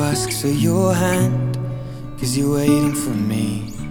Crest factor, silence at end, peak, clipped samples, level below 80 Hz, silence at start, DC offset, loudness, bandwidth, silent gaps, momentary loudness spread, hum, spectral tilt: 16 dB; 0 s; -4 dBFS; under 0.1%; -40 dBFS; 0 s; under 0.1%; -19 LUFS; 19.5 kHz; none; 10 LU; none; -5.5 dB/octave